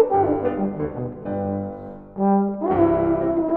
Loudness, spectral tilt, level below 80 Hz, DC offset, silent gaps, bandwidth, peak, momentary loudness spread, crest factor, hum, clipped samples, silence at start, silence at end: -22 LUFS; -12.5 dB/octave; -46 dBFS; under 0.1%; none; 3.4 kHz; -6 dBFS; 12 LU; 16 dB; 50 Hz at -35 dBFS; under 0.1%; 0 s; 0 s